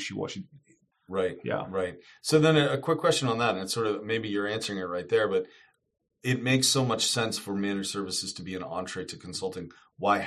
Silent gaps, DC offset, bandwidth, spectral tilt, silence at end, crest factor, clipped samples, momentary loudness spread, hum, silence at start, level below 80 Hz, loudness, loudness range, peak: none; under 0.1%; 13 kHz; -4 dB/octave; 0 s; 20 dB; under 0.1%; 13 LU; none; 0 s; -68 dBFS; -28 LUFS; 3 LU; -8 dBFS